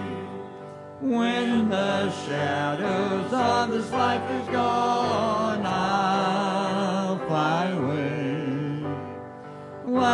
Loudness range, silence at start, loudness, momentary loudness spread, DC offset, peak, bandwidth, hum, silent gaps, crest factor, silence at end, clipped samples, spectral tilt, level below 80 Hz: 3 LU; 0 s; -25 LUFS; 14 LU; under 0.1%; -10 dBFS; 11.5 kHz; none; none; 16 dB; 0 s; under 0.1%; -6 dB/octave; -64 dBFS